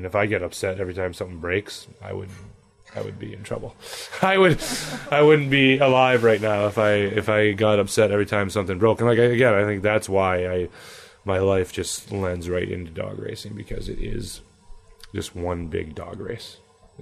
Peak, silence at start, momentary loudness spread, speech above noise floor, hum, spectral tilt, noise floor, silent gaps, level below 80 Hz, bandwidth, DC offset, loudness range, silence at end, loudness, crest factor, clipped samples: -6 dBFS; 0 s; 18 LU; 23 dB; none; -5.5 dB/octave; -45 dBFS; none; -44 dBFS; 13.5 kHz; under 0.1%; 14 LU; 0 s; -21 LUFS; 16 dB; under 0.1%